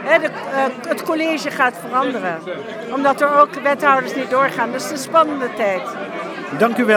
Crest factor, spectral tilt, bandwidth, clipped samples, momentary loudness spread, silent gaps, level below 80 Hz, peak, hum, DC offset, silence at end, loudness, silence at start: 18 dB; -4 dB/octave; 19.5 kHz; under 0.1%; 12 LU; none; -72 dBFS; 0 dBFS; none; under 0.1%; 0 s; -18 LUFS; 0 s